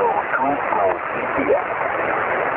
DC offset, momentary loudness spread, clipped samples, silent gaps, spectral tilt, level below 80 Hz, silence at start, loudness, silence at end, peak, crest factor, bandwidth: under 0.1%; 3 LU; under 0.1%; none; -9 dB/octave; -52 dBFS; 0 s; -20 LUFS; 0 s; -6 dBFS; 14 dB; 4 kHz